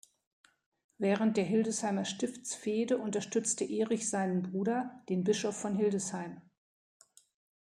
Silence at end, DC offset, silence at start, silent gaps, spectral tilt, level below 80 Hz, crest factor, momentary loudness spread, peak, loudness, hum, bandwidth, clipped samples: 1.2 s; under 0.1%; 1 s; none; -4.5 dB/octave; -78 dBFS; 18 dB; 7 LU; -16 dBFS; -33 LUFS; none; 13 kHz; under 0.1%